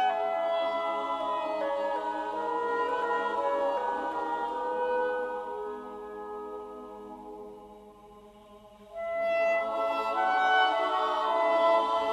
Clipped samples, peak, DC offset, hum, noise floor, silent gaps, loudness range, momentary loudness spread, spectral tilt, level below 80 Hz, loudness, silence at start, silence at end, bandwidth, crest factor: under 0.1%; -12 dBFS; under 0.1%; none; -53 dBFS; none; 13 LU; 17 LU; -3.5 dB/octave; -66 dBFS; -29 LUFS; 0 s; 0 s; 12.5 kHz; 18 dB